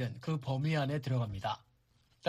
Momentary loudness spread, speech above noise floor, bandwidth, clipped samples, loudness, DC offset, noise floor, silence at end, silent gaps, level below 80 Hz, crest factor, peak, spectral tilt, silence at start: 7 LU; 36 dB; 12.5 kHz; under 0.1%; -35 LUFS; under 0.1%; -71 dBFS; 0 s; none; -62 dBFS; 18 dB; -18 dBFS; -7 dB/octave; 0 s